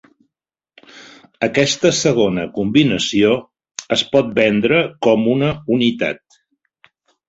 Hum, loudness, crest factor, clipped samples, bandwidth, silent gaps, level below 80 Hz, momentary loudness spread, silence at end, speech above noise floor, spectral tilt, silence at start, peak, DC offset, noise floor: none; -16 LUFS; 16 dB; under 0.1%; 8.2 kHz; none; -52 dBFS; 8 LU; 1.15 s; 70 dB; -4.5 dB/octave; 0.95 s; 0 dBFS; under 0.1%; -86 dBFS